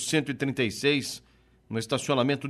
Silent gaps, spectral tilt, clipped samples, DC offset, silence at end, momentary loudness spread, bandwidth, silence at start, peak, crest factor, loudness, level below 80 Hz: none; -4.5 dB/octave; under 0.1%; under 0.1%; 0 s; 11 LU; 14.5 kHz; 0 s; -12 dBFS; 18 dB; -28 LUFS; -64 dBFS